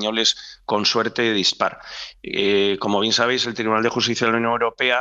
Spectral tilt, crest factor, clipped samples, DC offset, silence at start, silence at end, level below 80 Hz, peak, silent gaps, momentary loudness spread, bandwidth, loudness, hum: -3 dB/octave; 18 dB; under 0.1%; under 0.1%; 0 s; 0 s; -58 dBFS; -2 dBFS; none; 8 LU; 8.2 kHz; -20 LUFS; none